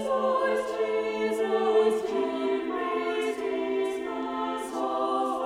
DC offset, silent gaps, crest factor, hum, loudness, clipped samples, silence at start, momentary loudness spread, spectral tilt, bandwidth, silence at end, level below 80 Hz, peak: under 0.1%; none; 14 dB; none; -28 LUFS; under 0.1%; 0 s; 7 LU; -4 dB/octave; 13.5 kHz; 0 s; -66 dBFS; -12 dBFS